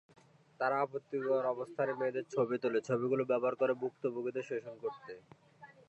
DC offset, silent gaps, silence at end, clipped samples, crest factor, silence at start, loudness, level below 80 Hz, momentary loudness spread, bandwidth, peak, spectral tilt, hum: under 0.1%; none; 0.15 s; under 0.1%; 16 dB; 0.6 s; -35 LUFS; -86 dBFS; 10 LU; 8.2 kHz; -20 dBFS; -7 dB/octave; none